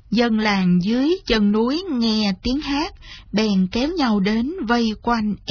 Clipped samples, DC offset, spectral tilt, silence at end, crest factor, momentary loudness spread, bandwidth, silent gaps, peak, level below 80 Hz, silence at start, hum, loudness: under 0.1%; under 0.1%; -6 dB/octave; 0 s; 16 dB; 5 LU; 5.4 kHz; none; -4 dBFS; -40 dBFS; 0.1 s; none; -20 LUFS